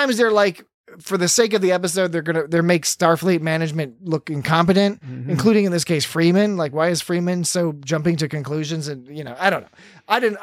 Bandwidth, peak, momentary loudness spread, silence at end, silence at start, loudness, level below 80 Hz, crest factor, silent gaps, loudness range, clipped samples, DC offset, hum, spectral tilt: 15.5 kHz; -2 dBFS; 10 LU; 0 s; 0 s; -19 LUFS; -58 dBFS; 18 dB; 0.74-0.84 s; 3 LU; under 0.1%; under 0.1%; none; -4.5 dB/octave